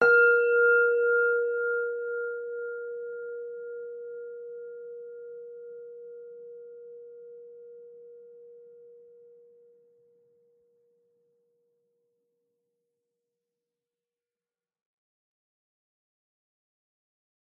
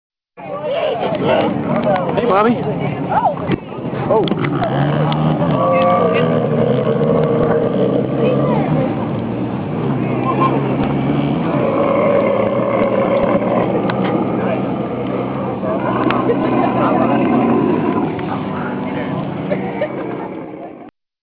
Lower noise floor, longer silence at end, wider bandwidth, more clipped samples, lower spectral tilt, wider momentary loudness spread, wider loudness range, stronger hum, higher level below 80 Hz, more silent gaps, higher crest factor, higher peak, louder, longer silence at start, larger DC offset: first, under -90 dBFS vs -38 dBFS; first, 8.5 s vs 0.4 s; second, 4.5 kHz vs 5 kHz; neither; second, -1 dB/octave vs -11 dB/octave; first, 26 LU vs 7 LU; first, 25 LU vs 3 LU; neither; second, under -90 dBFS vs -44 dBFS; neither; first, 20 dB vs 12 dB; second, -12 dBFS vs -4 dBFS; second, -26 LUFS vs -16 LUFS; second, 0 s vs 0.35 s; neither